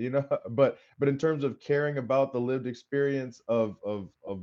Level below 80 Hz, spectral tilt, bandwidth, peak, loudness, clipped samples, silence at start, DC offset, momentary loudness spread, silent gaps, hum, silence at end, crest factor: -74 dBFS; -8 dB/octave; 7.4 kHz; -10 dBFS; -29 LUFS; under 0.1%; 0 s; under 0.1%; 8 LU; none; none; 0 s; 18 dB